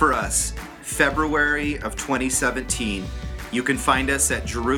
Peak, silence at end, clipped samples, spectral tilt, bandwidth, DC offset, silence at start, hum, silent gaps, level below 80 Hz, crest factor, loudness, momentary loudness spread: -4 dBFS; 0 s; under 0.1%; -3 dB/octave; 20 kHz; under 0.1%; 0 s; none; none; -34 dBFS; 20 dB; -22 LUFS; 10 LU